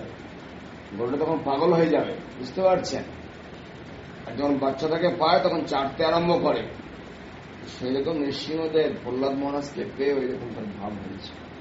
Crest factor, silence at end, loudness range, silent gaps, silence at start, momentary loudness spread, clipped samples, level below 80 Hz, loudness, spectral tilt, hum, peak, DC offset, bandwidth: 20 dB; 0 s; 4 LU; none; 0 s; 20 LU; under 0.1%; -56 dBFS; -25 LUFS; -4.5 dB/octave; none; -6 dBFS; under 0.1%; 7.6 kHz